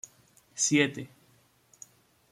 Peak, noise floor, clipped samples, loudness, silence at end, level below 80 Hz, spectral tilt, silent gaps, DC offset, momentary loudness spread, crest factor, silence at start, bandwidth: -12 dBFS; -65 dBFS; under 0.1%; -26 LUFS; 1.25 s; -74 dBFS; -3 dB/octave; none; under 0.1%; 27 LU; 22 dB; 0.55 s; 14.5 kHz